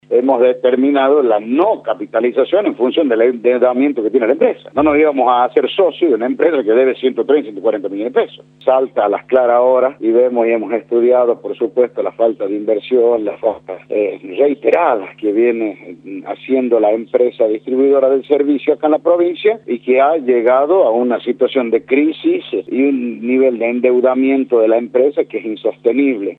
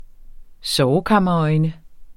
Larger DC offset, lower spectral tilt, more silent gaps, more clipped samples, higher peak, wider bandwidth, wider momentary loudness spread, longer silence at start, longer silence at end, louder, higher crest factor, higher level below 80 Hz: neither; first, -8 dB/octave vs -6 dB/octave; neither; neither; first, 0 dBFS vs -4 dBFS; second, 4.1 kHz vs 14.5 kHz; about the same, 7 LU vs 8 LU; about the same, 0.1 s vs 0 s; about the same, 0.05 s vs 0.05 s; first, -14 LUFS vs -18 LUFS; about the same, 14 dB vs 16 dB; second, -60 dBFS vs -42 dBFS